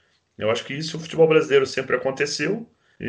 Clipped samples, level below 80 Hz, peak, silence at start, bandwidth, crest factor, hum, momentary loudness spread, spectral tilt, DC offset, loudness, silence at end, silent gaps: under 0.1%; -62 dBFS; -6 dBFS; 0.4 s; 10 kHz; 18 dB; none; 11 LU; -4.5 dB/octave; under 0.1%; -22 LUFS; 0 s; none